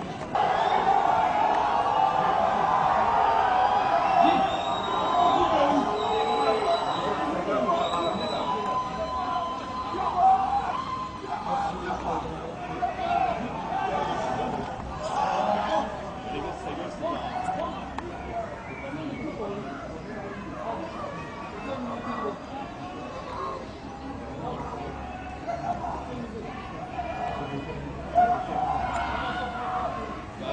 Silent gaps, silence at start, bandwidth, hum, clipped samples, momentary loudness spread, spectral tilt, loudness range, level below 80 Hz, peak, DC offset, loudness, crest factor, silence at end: none; 0 s; 9.6 kHz; none; under 0.1%; 14 LU; -5.5 dB/octave; 12 LU; -48 dBFS; -6 dBFS; under 0.1%; -27 LUFS; 20 dB; 0 s